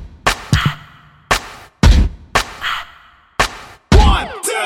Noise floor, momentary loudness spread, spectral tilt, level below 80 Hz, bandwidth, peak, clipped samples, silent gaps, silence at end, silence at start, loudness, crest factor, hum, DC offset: -45 dBFS; 16 LU; -4.5 dB/octave; -18 dBFS; 16 kHz; 0 dBFS; under 0.1%; none; 0 s; 0 s; -16 LUFS; 16 dB; none; under 0.1%